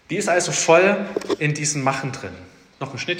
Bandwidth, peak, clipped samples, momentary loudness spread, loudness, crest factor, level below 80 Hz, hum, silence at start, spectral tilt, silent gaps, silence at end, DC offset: 16 kHz; 0 dBFS; under 0.1%; 18 LU; -19 LUFS; 20 dB; -62 dBFS; none; 0.1 s; -3.5 dB/octave; none; 0 s; under 0.1%